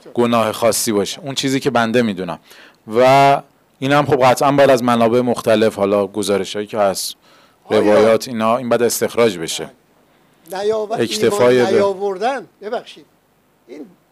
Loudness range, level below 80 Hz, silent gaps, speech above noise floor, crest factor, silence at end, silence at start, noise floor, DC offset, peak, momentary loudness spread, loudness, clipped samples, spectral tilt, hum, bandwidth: 4 LU; -58 dBFS; none; 42 dB; 10 dB; 0.25 s; 0.05 s; -58 dBFS; under 0.1%; -6 dBFS; 13 LU; -16 LUFS; under 0.1%; -4.5 dB/octave; none; 16 kHz